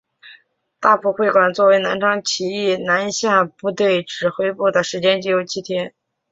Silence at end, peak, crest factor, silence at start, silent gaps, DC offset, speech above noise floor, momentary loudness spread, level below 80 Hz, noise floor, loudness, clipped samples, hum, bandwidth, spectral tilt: 0.4 s; -2 dBFS; 16 dB; 0.25 s; none; under 0.1%; 35 dB; 8 LU; -64 dBFS; -53 dBFS; -18 LUFS; under 0.1%; none; 7.8 kHz; -3.5 dB/octave